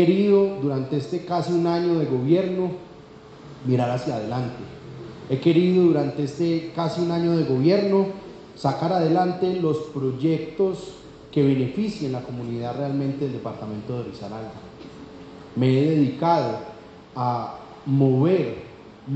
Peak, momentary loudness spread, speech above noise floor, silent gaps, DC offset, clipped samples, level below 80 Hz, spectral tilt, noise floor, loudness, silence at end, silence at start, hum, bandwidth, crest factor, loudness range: -6 dBFS; 20 LU; 22 dB; none; under 0.1%; under 0.1%; -58 dBFS; -8.5 dB/octave; -44 dBFS; -23 LUFS; 0 s; 0 s; none; 8.2 kHz; 16 dB; 5 LU